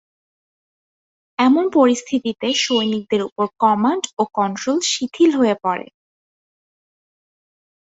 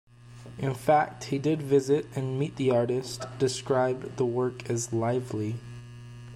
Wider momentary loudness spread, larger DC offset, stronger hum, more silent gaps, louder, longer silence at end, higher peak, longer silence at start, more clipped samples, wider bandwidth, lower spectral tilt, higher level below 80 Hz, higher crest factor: second, 7 LU vs 16 LU; neither; neither; first, 3.32-3.36 s, 4.13-4.17 s vs none; first, -18 LUFS vs -28 LUFS; first, 2.1 s vs 0 s; first, -2 dBFS vs -10 dBFS; first, 1.4 s vs 0.25 s; neither; second, 8 kHz vs 13.5 kHz; second, -3.5 dB/octave vs -6 dB/octave; second, -66 dBFS vs -60 dBFS; about the same, 18 dB vs 18 dB